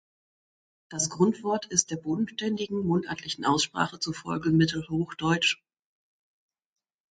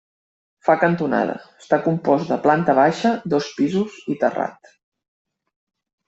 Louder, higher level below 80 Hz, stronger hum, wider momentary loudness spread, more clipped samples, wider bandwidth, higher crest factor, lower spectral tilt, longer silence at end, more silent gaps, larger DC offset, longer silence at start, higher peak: second, -27 LUFS vs -20 LUFS; about the same, -62 dBFS vs -62 dBFS; neither; about the same, 7 LU vs 9 LU; neither; first, 9.4 kHz vs 8 kHz; about the same, 22 dB vs 18 dB; second, -4 dB/octave vs -7 dB/octave; about the same, 1.55 s vs 1.55 s; neither; neither; first, 0.9 s vs 0.65 s; second, -6 dBFS vs -2 dBFS